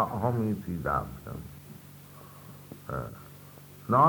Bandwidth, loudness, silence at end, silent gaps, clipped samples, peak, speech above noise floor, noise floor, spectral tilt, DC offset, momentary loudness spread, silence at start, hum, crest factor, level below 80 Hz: 19.5 kHz; -33 LUFS; 0 s; none; under 0.1%; -10 dBFS; 18 dB; -49 dBFS; -8 dB/octave; under 0.1%; 20 LU; 0 s; none; 22 dB; -52 dBFS